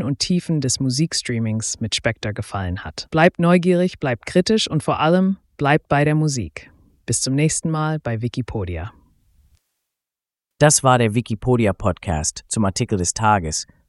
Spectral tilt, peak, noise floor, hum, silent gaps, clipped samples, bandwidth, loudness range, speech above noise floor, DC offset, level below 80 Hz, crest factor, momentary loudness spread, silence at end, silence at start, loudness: -4.5 dB/octave; 0 dBFS; -89 dBFS; none; none; under 0.1%; 12 kHz; 6 LU; 70 dB; under 0.1%; -42 dBFS; 20 dB; 11 LU; 0.25 s; 0 s; -19 LUFS